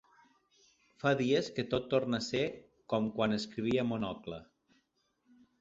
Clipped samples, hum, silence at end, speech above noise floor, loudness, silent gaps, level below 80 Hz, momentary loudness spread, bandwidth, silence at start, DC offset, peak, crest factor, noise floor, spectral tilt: under 0.1%; none; 1.15 s; 44 dB; -33 LUFS; none; -64 dBFS; 10 LU; 7.8 kHz; 1.05 s; under 0.1%; -16 dBFS; 20 dB; -77 dBFS; -5.5 dB/octave